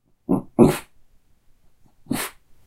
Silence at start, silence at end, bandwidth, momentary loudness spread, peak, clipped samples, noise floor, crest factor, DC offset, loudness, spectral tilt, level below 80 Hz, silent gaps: 0.3 s; 0.35 s; 16 kHz; 13 LU; 0 dBFS; under 0.1%; -55 dBFS; 24 dB; under 0.1%; -22 LUFS; -6 dB/octave; -50 dBFS; none